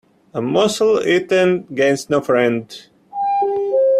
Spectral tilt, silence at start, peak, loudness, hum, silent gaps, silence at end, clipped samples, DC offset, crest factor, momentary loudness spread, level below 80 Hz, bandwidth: -5 dB/octave; 0.35 s; -2 dBFS; -17 LUFS; none; none; 0 s; under 0.1%; under 0.1%; 14 dB; 12 LU; -60 dBFS; 14 kHz